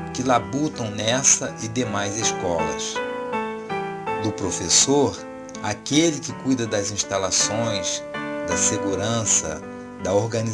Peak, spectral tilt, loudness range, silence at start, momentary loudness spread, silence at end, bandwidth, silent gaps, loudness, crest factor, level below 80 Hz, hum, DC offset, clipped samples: -2 dBFS; -3 dB/octave; 2 LU; 0 s; 12 LU; 0 s; 10.5 kHz; none; -22 LUFS; 22 dB; -52 dBFS; none; under 0.1%; under 0.1%